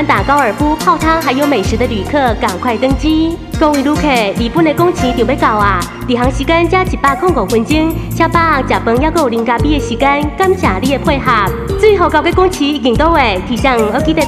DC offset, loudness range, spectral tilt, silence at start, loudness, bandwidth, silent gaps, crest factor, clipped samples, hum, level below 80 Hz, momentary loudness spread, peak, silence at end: under 0.1%; 1 LU; -5.5 dB/octave; 0 s; -12 LUFS; 15.5 kHz; none; 12 dB; under 0.1%; none; -24 dBFS; 4 LU; 0 dBFS; 0 s